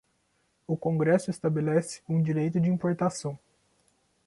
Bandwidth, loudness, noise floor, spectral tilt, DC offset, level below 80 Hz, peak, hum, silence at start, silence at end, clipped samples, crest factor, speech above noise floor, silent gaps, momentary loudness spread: 11.5 kHz; -28 LUFS; -72 dBFS; -7.5 dB/octave; under 0.1%; -66 dBFS; -12 dBFS; none; 0.7 s; 0.9 s; under 0.1%; 18 dB; 45 dB; none; 10 LU